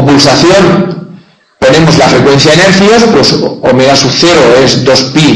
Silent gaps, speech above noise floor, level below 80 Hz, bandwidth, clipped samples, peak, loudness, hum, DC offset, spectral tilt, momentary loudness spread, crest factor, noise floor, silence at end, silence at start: none; 31 dB; -34 dBFS; 11 kHz; 7%; 0 dBFS; -4 LUFS; none; under 0.1%; -4.5 dB/octave; 5 LU; 4 dB; -35 dBFS; 0 s; 0 s